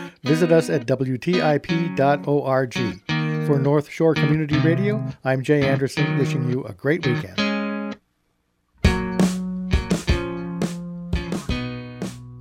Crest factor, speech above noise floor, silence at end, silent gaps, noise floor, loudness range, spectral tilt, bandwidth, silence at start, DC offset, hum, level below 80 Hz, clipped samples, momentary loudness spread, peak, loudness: 18 dB; 49 dB; 0 s; none; -69 dBFS; 4 LU; -6.5 dB/octave; 15.5 kHz; 0 s; under 0.1%; none; -34 dBFS; under 0.1%; 9 LU; -4 dBFS; -22 LUFS